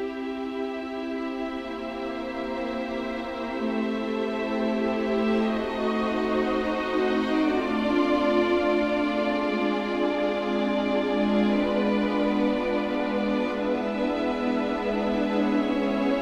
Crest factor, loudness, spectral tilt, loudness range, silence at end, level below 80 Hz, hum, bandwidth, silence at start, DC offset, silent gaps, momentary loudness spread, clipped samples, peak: 14 dB; -26 LUFS; -6.5 dB/octave; 6 LU; 0 s; -52 dBFS; none; 9.8 kHz; 0 s; under 0.1%; none; 8 LU; under 0.1%; -12 dBFS